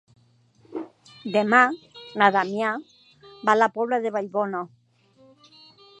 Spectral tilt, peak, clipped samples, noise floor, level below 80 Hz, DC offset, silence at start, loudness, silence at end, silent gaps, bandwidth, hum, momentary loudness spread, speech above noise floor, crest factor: -5 dB/octave; -2 dBFS; under 0.1%; -59 dBFS; -76 dBFS; under 0.1%; 0.7 s; -22 LUFS; 1.35 s; none; 10.5 kHz; none; 19 LU; 37 dB; 24 dB